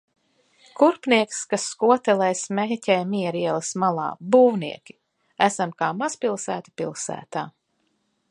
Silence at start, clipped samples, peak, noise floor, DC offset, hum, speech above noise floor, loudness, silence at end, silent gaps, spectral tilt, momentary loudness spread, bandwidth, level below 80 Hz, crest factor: 0.8 s; under 0.1%; -2 dBFS; -71 dBFS; under 0.1%; none; 49 dB; -23 LUFS; 0.8 s; none; -4.5 dB/octave; 13 LU; 11.5 kHz; -74 dBFS; 22 dB